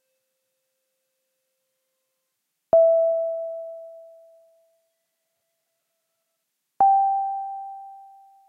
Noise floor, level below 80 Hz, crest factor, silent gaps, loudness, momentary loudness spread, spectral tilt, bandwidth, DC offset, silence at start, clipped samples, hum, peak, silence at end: -79 dBFS; -70 dBFS; 18 dB; none; -21 LUFS; 21 LU; -7.5 dB/octave; 1.9 kHz; under 0.1%; 2.75 s; under 0.1%; none; -8 dBFS; 0.45 s